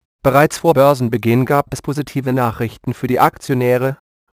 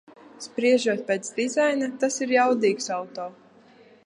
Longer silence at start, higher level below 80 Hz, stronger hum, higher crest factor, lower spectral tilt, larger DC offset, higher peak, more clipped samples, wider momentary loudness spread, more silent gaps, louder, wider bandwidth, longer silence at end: about the same, 0.25 s vs 0.25 s; first, -46 dBFS vs -80 dBFS; neither; about the same, 16 dB vs 18 dB; first, -6.5 dB/octave vs -3.5 dB/octave; neither; first, 0 dBFS vs -8 dBFS; neither; second, 10 LU vs 15 LU; neither; first, -16 LUFS vs -24 LUFS; first, 15.5 kHz vs 11.5 kHz; second, 0.4 s vs 0.75 s